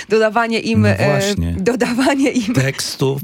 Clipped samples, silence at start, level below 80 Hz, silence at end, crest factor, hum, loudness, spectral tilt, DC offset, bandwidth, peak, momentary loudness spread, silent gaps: under 0.1%; 0 s; -42 dBFS; 0 s; 14 dB; none; -16 LUFS; -5.5 dB/octave; under 0.1%; 17 kHz; -2 dBFS; 4 LU; none